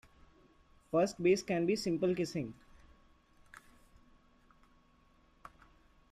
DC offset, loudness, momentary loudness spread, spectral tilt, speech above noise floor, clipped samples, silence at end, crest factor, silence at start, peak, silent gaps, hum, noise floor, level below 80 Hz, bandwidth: under 0.1%; -33 LUFS; 27 LU; -6 dB/octave; 35 dB; under 0.1%; 3.6 s; 20 dB; 0.9 s; -18 dBFS; none; none; -67 dBFS; -66 dBFS; 14 kHz